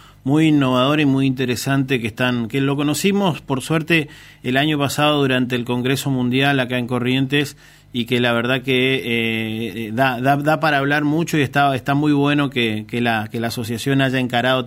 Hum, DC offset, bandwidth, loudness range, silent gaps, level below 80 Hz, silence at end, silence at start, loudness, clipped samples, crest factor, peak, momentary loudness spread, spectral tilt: none; under 0.1%; 16 kHz; 2 LU; none; -52 dBFS; 0 s; 0.25 s; -18 LUFS; under 0.1%; 16 dB; -2 dBFS; 5 LU; -5.5 dB/octave